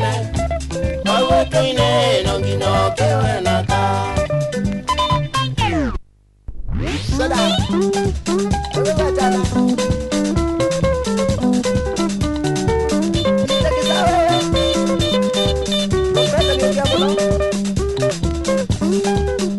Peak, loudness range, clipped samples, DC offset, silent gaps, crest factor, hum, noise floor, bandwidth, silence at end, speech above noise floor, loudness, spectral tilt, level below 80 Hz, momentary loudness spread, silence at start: -2 dBFS; 3 LU; under 0.1%; under 0.1%; none; 14 dB; none; -44 dBFS; 12 kHz; 0 s; 28 dB; -17 LUFS; -5 dB/octave; -28 dBFS; 5 LU; 0 s